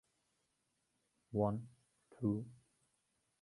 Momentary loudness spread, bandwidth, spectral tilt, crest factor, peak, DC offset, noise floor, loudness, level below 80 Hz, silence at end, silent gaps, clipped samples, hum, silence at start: 16 LU; 11.5 kHz; -10.5 dB/octave; 22 dB; -22 dBFS; under 0.1%; -83 dBFS; -40 LUFS; -70 dBFS; 0.85 s; none; under 0.1%; none; 1.3 s